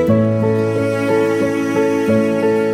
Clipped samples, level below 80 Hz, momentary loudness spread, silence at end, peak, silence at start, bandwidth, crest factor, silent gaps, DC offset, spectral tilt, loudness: under 0.1%; -52 dBFS; 2 LU; 0 s; -2 dBFS; 0 s; 15.5 kHz; 12 dB; none; under 0.1%; -7.5 dB/octave; -16 LUFS